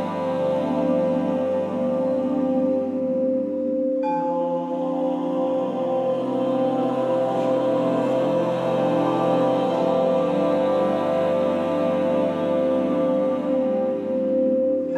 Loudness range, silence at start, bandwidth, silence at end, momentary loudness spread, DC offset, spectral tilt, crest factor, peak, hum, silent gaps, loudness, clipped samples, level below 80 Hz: 2 LU; 0 s; 8.4 kHz; 0 s; 3 LU; under 0.1%; -8 dB/octave; 12 dB; -10 dBFS; none; none; -22 LUFS; under 0.1%; -78 dBFS